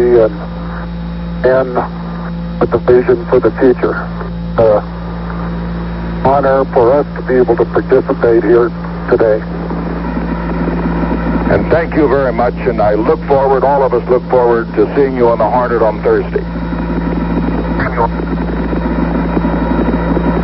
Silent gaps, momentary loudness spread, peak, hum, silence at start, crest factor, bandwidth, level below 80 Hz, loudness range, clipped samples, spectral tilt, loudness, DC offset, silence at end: none; 10 LU; 0 dBFS; none; 0 s; 12 dB; 5.8 kHz; -24 dBFS; 3 LU; under 0.1%; -12 dB/octave; -13 LUFS; under 0.1%; 0 s